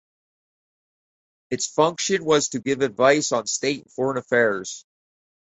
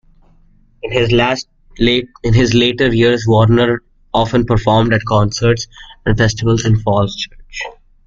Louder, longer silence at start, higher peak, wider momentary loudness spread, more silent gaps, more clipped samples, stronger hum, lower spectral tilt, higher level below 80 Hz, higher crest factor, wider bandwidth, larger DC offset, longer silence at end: second, -22 LUFS vs -14 LUFS; first, 1.5 s vs 0.85 s; second, -4 dBFS vs 0 dBFS; second, 10 LU vs 13 LU; neither; neither; neither; second, -3 dB/octave vs -6 dB/octave; second, -66 dBFS vs -32 dBFS; first, 20 dB vs 14 dB; first, 8.4 kHz vs 7.6 kHz; neither; first, 0.7 s vs 0.35 s